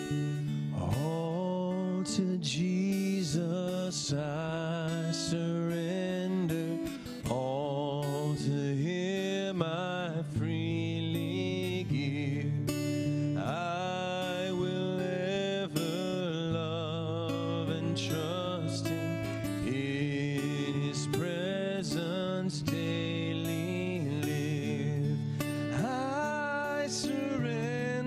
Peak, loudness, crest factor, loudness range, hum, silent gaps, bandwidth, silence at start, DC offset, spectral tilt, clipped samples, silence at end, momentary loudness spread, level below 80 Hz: -14 dBFS; -33 LUFS; 18 dB; 1 LU; none; none; 15.5 kHz; 0 s; under 0.1%; -6 dB/octave; under 0.1%; 0 s; 2 LU; -62 dBFS